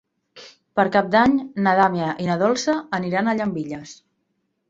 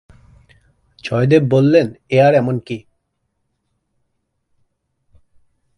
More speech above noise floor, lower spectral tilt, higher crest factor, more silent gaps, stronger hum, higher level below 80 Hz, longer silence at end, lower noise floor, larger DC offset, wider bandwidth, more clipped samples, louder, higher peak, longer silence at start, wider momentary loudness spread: second, 52 dB vs 57 dB; second, -5.5 dB/octave vs -8 dB/octave; about the same, 20 dB vs 18 dB; neither; neither; about the same, -58 dBFS vs -54 dBFS; second, 0.75 s vs 3 s; about the same, -72 dBFS vs -71 dBFS; neither; second, 8 kHz vs 11 kHz; neither; second, -20 LUFS vs -15 LUFS; about the same, -2 dBFS vs 0 dBFS; second, 0.35 s vs 1.05 s; second, 10 LU vs 17 LU